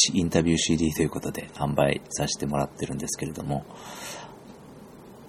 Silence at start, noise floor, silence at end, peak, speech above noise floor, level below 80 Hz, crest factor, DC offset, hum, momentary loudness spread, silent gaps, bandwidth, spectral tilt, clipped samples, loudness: 0 s; -46 dBFS; 0 s; -4 dBFS; 20 dB; -48 dBFS; 22 dB; under 0.1%; none; 24 LU; none; 16.5 kHz; -4 dB/octave; under 0.1%; -27 LUFS